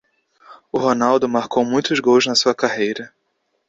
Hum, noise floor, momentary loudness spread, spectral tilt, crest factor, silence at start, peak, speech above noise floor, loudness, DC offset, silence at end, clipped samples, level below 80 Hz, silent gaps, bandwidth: none; -70 dBFS; 10 LU; -3.5 dB/octave; 16 dB; 0.5 s; -2 dBFS; 52 dB; -18 LUFS; under 0.1%; 0.65 s; under 0.1%; -60 dBFS; none; 7.8 kHz